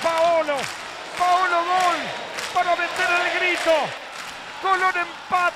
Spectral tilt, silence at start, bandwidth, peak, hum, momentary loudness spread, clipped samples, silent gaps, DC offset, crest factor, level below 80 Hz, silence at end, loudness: -2 dB/octave; 0 s; 15.5 kHz; -8 dBFS; none; 12 LU; under 0.1%; none; under 0.1%; 14 dB; -62 dBFS; 0 s; -21 LUFS